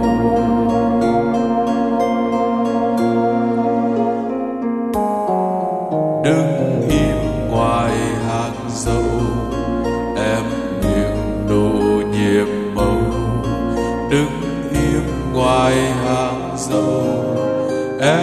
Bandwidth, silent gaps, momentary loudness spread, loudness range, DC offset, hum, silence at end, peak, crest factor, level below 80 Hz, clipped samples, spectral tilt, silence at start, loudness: 14 kHz; none; 5 LU; 2 LU; under 0.1%; none; 0 s; -2 dBFS; 14 dB; -32 dBFS; under 0.1%; -6.5 dB/octave; 0 s; -18 LUFS